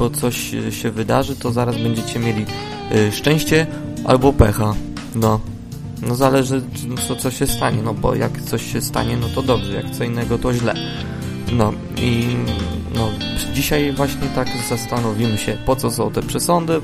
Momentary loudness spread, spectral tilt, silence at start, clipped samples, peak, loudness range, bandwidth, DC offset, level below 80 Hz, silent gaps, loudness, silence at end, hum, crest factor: 8 LU; -5.5 dB/octave; 0 s; under 0.1%; 0 dBFS; 3 LU; 15.5 kHz; under 0.1%; -32 dBFS; none; -19 LUFS; 0 s; none; 18 dB